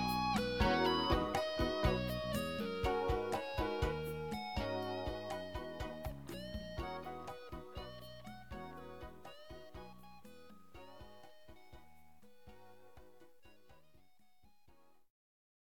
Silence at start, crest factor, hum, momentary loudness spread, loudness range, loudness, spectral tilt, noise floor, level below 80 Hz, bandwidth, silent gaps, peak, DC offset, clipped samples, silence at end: 0 s; 22 dB; none; 24 LU; 24 LU; -39 LUFS; -5.5 dB/octave; -73 dBFS; -50 dBFS; 19 kHz; none; -20 dBFS; 0.1%; under 0.1%; 0.5 s